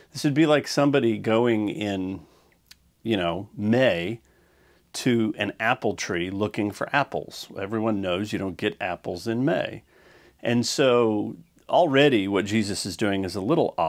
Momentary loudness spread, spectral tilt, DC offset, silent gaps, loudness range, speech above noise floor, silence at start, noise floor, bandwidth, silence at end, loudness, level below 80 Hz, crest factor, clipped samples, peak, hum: 13 LU; -5 dB/octave; under 0.1%; none; 5 LU; 36 dB; 0.15 s; -60 dBFS; 16 kHz; 0 s; -24 LUFS; -62 dBFS; 20 dB; under 0.1%; -4 dBFS; none